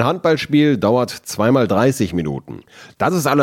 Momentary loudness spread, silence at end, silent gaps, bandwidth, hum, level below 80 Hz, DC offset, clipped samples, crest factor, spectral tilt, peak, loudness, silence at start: 11 LU; 0 s; none; 16.5 kHz; none; -52 dBFS; under 0.1%; under 0.1%; 16 dB; -6 dB/octave; 0 dBFS; -17 LUFS; 0 s